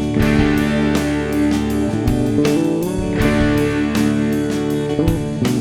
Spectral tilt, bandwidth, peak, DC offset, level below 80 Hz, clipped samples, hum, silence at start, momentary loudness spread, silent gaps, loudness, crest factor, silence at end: -6.5 dB/octave; 16 kHz; -2 dBFS; under 0.1%; -30 dBFS; under 0.1%; none; 0 s; 4 LU; none; -17 LUFS; 14 dB; 0 s